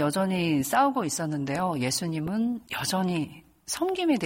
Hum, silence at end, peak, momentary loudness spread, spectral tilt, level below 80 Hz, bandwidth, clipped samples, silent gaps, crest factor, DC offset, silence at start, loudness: none; 0 s; -12 dBFS; 7 LU; -4.5 dB/octave; -60 dBFS; 16.5 kHz; under 0.1%; none; 16 dB; under 0.1%; 0 s; -27 LUFS